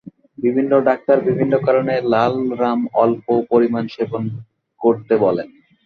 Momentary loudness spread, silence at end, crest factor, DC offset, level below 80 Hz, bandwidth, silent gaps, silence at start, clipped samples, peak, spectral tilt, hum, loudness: 8 LU; 0.4 s; 16 dB; under 0.1%; -60 dBFS; 6.4 kHz; none; 0.05 s; under 0.1%; -2 dBFS; -9 dB/octave; none; -18 LUFS